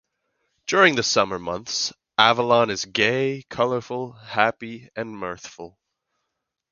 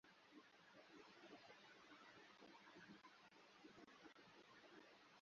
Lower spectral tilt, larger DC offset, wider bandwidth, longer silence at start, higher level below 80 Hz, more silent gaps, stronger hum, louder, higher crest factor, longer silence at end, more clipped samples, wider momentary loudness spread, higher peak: about the same, -3 dB/octave vs -2 dB/octave; neither; about the same, 7.4 kHz vs 7 kHz; first, 0.7 s vs 0.05 s; first, -60 dBFS vs under -90 dBFS; neither; neither; first, -21 LUFS vs -66 LUFS; first, 24 dB vs 16 dB; first, 1.05 s vs 0 s; neither; first, 17 LU vs 4 LU; first, 0 dBFS vs -50 dBFS